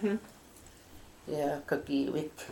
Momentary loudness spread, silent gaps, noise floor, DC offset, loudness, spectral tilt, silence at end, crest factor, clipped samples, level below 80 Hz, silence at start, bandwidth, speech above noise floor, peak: 22 LU; none; -55 dBFS; under 0.1%; -34 LUFS; -6 dB/octave; 0 s; 18 dB; under 0.1%; -62 dBFS; 0 s; 17 kHz; 22 dB; -16 dBFS